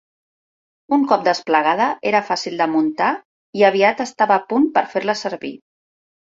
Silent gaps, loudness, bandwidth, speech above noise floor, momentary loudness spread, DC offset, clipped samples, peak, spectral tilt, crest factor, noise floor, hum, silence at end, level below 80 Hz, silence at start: 3.25-3.53 s; -18 LUFS; 7.8 kHz; over 72 dB; 8 LU; under 0.1%; under 0.1%; -2 dBFS; -4.5 dB/octave; 18 dB; under -90 dBFS; none; 0.65 s; -68 dBFS; 0.9 s